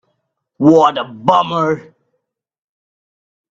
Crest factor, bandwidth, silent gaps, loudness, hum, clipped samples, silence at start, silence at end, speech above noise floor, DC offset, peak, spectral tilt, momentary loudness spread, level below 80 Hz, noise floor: 16 dB; 7.6 kHz; none; -14 LUFS; none; under 0.1%; 0.6 s; 1.7 s; 59 dB; under 0.1%; 0 dBFS; -7 dB/octave; 9 LU; -60 dBFS; -72 dBFS